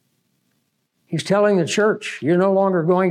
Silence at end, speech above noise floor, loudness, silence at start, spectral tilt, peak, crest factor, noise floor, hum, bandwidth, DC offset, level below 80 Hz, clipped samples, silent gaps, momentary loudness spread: 0 s; 52 dB; -18 LUFS; 1.1 s; -6 dB/octave; -6 dBFS; 12 dB; -69 dBFS; none; 12 kHz; under 0.1%; -76 dBFS; under 0.1%; none; 7 LU